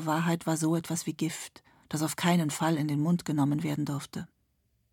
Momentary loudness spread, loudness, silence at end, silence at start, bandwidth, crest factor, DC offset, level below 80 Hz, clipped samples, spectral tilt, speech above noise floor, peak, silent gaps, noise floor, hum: 13 LU; -30 LUFS; 0.65 s; 0 s; 18.5 kHz; 20 dB; under 0.1%; -70 dBFS; under 0.1%; -5.5 dB/octave; 44 dB; -10 dBFS; none; -73 dBFS; none